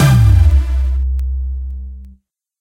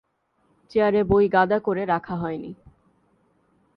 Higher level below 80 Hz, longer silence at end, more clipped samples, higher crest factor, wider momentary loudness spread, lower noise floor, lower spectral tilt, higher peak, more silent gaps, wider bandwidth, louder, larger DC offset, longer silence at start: first, -16 dBFS vs -50 dBFS; second, 0.5 s vs 1.2 s; neither; second, 12 dB vs 18 dB; first, 18 LU vs 12 LU; second, -48 dBFS vs -67 dBFS; second, -6.5 dB/octave vs -9 dB/octave; first, 0 dBFS vs -6 dBFS; neither; first, 15.5 kHz vs 5.6 kHz; first, -15 LUFS vs -22 LUFS; neither; second, 0 s vs 0.75 s